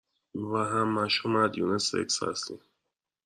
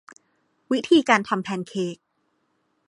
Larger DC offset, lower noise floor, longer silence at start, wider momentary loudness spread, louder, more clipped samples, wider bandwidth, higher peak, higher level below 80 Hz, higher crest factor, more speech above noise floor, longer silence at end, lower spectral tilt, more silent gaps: neither; first, -84 dBFS vs -71 dBFS; second, 0.35 s vs 0.7 s; about the same, 13 LU vs 12 LU; second, -28 LUFS vs -22 LUFS; neither; first, 12.5 kHz vs 11 kHz; second, -12 dBFS vs -2 dBFS; about the same, -72 dBFS vs -70 dBFS; about the same, 18 dB vs 22 dB; first, 56 dB vs 49 dB; second, 0.7 s vs 0.95 s; second, -3.5 dB/octave vs -5 dB/octave; neither